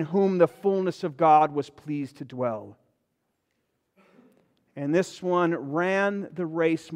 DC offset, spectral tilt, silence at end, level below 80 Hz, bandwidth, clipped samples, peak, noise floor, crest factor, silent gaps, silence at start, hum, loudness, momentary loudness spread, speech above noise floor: under 0.1%; -7 dB/octave; 0 s; -76 dBFS; 11.5 kHz; under 0.1%; -8 dBFS; -77 dBFS; 18 dB; none; 0 s; none; -25 LUFS; 13 LU; 52 dB